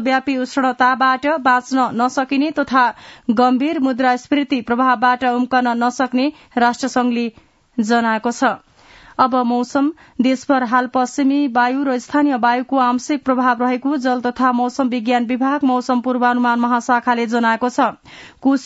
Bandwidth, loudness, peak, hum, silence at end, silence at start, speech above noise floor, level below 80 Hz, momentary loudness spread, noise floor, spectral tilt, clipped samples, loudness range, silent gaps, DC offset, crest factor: 8 kHz; -17 LUFS; 0 dBFS; none; 0 s; 0 s; 29 dB; -60 dBFS; 4 LU; -45 dBFS; -4 dB/octave; under 0.1%; 2 LU; none; under 0.1%; 16 dB